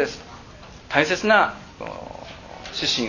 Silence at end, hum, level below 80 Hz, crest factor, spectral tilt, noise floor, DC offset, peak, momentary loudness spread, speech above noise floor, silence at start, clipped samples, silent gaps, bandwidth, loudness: 0 s; none; -50 dBFS; 24 dB; -3 dB/octave; -43 dBFS; under 0.1%; 0 dBFS; 24 LU; 21 dB; 0 s; under 0.1%; none; 7.4 kHz; -21 LUFS